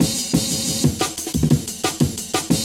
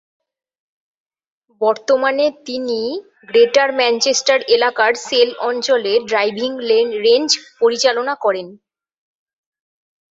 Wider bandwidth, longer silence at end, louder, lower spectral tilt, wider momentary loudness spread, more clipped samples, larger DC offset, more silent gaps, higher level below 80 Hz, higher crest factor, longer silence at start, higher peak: first, 17 kHz vs 8 kHz; second, 0 s vs 1.55 s; second, -20 LUFS vs -16 LUFS; first, -4 dB/octave vs -1.5 dB/octave; second, 4 LU vs 8 LU; neither; neither; neither; first, -38 dBFS vs -66 dBFS; about the same, 18 dB vs 18 dB; second, 0 s vs 1.6 s; second, -4 dBFS vs 0 dBFS